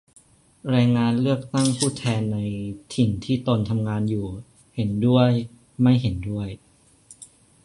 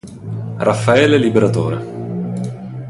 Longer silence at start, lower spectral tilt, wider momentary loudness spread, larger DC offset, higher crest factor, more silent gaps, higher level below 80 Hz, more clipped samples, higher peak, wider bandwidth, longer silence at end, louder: first, 0.65 s vs 0.05 s; about the same, -6.5 dB/octave vs -6.5 dB/octave; about the same, 15 LU vs 15 LU; neither; about the same, 18 dB vs 16 dB; neither; about the same, -48 dBFS vs -48 dBFS; neither; second, -4 dBFS vs 0 dBFS; about the same, 11.5 kHz vs 11.5 kHz; first, 0.4 s vs 0 s; second, -23 LUFS vs -16 LUFS